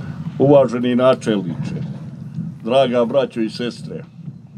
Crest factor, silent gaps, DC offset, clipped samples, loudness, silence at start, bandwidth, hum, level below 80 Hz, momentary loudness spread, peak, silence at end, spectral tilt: 18 dB; none; under 0.1%; under 0.1%; -17 LUFS; 0 s; 11 kHz; none; -56 dBFS; 18 LU; 0 dBFS; 0 s; -7 dB/octave